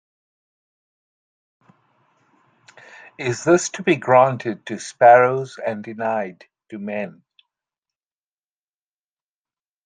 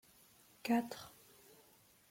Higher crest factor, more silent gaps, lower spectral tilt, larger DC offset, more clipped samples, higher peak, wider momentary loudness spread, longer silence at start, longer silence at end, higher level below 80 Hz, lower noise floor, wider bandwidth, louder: about the same, 20 dB vs 20 dB; neither; about the same, -5 dB/octave vs -4.5 dB/octave; neither; neither; first, -2 dBFS vs -24 dBFS; second, 19 LU vs 25 LU; first, 3.2 s vs 0.65 s; first, 2.75 s vs 1 s; first, -70 dBFS vs -80 dBFS; first, under -90 dBFS vs -68 dBFS; second, 9.6 kHz vs 16.5 kHz; first, -19 LUFS vs -39 LUFS